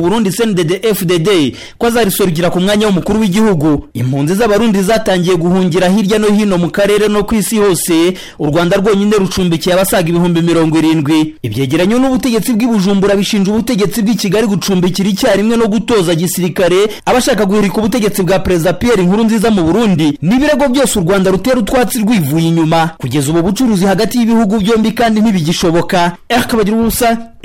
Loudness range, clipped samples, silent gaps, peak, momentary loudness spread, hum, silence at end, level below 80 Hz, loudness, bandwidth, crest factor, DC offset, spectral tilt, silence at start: 1 LU; under 0.1%; none; -4 dBFS; 3 LU; none; 0 s; -34 dBFS; -11 LUFS; 17 kHz; 6 dB; 0.9%; -5.5 dB/octave; 0 s